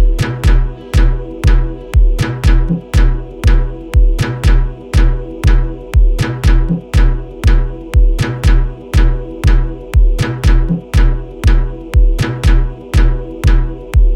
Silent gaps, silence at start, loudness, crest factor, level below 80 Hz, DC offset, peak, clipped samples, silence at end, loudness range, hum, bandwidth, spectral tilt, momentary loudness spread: none; 0 s; -15 LUFS; 10 dB; -12 dBFS; under 0.1%; 0 dBFS; under 0.1%; 0 s; 0 LU; none; 11 kHz; -6.5 dB/octave; 4 LU